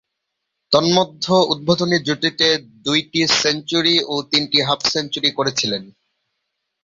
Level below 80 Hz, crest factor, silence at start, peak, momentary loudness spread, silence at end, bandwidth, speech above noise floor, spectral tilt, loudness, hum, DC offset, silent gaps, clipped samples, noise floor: -58 dBFS; 18 dB; 0.7 s; -2 dBFS; 4 LU; 0.95 s; 7.8 kHz; 59 dB; -3.5 dB/octave; -17 LUFS; none; under 0.1%; none; under 0.1%; -77 dBFS